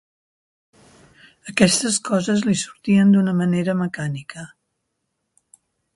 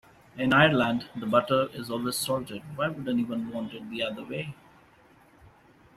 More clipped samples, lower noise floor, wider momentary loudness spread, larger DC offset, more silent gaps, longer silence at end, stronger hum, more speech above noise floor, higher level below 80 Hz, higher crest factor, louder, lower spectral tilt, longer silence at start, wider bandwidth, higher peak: neither; first, -76 dBFS vs -58 dBFS; first, 19 LU vs 15 LU; neither; neither; about the same, 1.5 s vs 1.45 s; neither; first, 57 dB vs 30 dB; about the same, -58 dBFS vs -62 dBFS; about the same, 20 dB vs 24 dB; first, -19 LUFS vs -27 LUFS; about the same, -5 dB/octave vs -5 dB/octave; first, 1.45 s vs 0.35 s; second, 11.5 kHz vs 15.5 kHz; first, 0 dBFS vs -6 dBFS